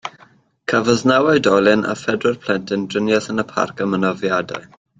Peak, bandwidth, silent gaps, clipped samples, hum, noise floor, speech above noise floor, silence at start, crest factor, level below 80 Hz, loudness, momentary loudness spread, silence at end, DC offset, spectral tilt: -2 dBFS; 9.4 kHz; none; under 0.1%; none; -51 dBFS; 34 dB; 0.05 s; 16 dB; -56 dBFS; -18 LUFS; 8 LU; 0.35 s; under 0.1%; -5 dB/octave